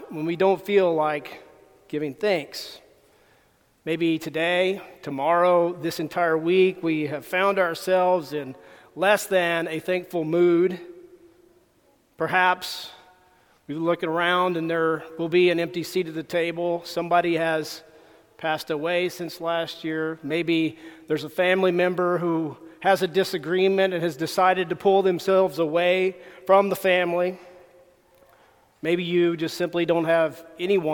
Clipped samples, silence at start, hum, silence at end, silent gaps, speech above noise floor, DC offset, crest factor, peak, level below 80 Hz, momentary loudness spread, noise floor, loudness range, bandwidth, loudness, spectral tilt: under 0.1%; 0 s; none; 0 s; none; 39 dB; under 0.1%; 20 dB; -4 dBFS; -70 dBFS; 11 LU; -62 dBFS; 5 LU; 19 kHz; -23 LUFS; -5.5 dB/octave